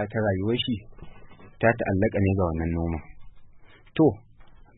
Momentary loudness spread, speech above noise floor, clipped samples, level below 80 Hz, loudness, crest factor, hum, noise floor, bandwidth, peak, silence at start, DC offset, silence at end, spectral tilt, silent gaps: 11 LU; 25 dB; under 0.1%; -44 dBFS; -25 LUFS; 20 dB; none; -49 dBFS; 4 kHz; -6 dBFS; 0 s; under 0.1%; 0.25 s; -11 dB/octave; none